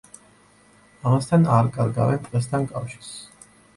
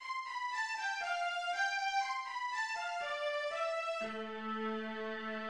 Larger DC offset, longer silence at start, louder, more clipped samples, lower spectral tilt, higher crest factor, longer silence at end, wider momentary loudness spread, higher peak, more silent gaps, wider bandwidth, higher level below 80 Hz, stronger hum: neither; first, 1.05 s vs 0 s; first, -22 LUFS vs -37 LUFS; neither; first, -7.5 dB/octave vs -2 dB/octave; about the same, 18 dB vs 14 dB; first, 0.5 s vs 0 s; first, 18 LU vs 6 LU; first, -6 dBFS vs -24 dBFS; neither; second, 11.5 kHz vs 13 kHz; first, -54 dBFS vs -80 dBFS; neither